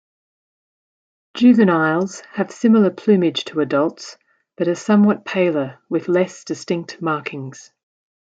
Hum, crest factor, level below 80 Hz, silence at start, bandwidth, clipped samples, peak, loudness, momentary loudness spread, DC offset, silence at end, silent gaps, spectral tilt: none; 16 dB; -68 dBFS; 1.35 s; 8 kHz; under 0.1%; -2 dBFS; -18 LUFS; 14 LU; under 0.1%; 0.75 s; none; -6.5 dB/octave